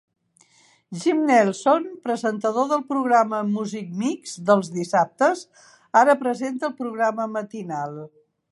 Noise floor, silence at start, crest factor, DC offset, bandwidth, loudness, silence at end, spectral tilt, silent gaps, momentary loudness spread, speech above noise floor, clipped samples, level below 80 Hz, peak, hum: -59 dBFS; 0.9 s; 20 dB; under 0.1%; 11.5 kHz; -22 LUFS; 0.45 s; -5.5 dB/octave; none; 12 LU; 37 dB; under 0.1%; -78 dBFS; -2 dBFS; none